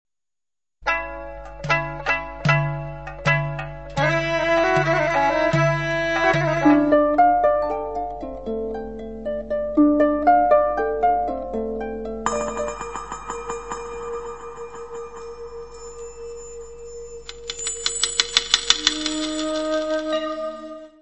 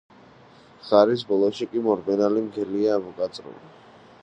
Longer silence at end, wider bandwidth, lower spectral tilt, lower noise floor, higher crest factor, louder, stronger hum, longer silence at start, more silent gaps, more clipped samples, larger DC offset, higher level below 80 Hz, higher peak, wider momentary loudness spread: second, 0 s vs 0.55 s; about the same, 8.4 kHz vs 8.6 kHz; second, -4 dB/octave vs -6.5 dB/octave; first, under -90 dBFS vs -51 dBFS; about the same, 22 dB vs 22 dB; about the same, -21 LUFS vs -23 LUFS; neither; second, 0.05 s vs 0.85 s; neither; neither; first, 0.5% vs under 0.1%; first, -44 dBFS vs -68 dBFS; about the same, 0 dBFS vs -2 dBFS; first, 19 LU vs 13 LU